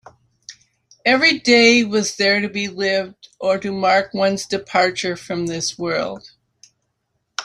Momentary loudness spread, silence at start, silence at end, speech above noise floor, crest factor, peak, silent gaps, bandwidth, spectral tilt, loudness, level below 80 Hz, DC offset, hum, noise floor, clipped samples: 12 LU; 0.5 s; 0 s; 54 dB; 18 dB; -2 dBFS; none; 13 kHz; -3 dB/octave; -18 LUFS; -60 dBFS; under 0.1%; none; -72 dBFS; under 0.1%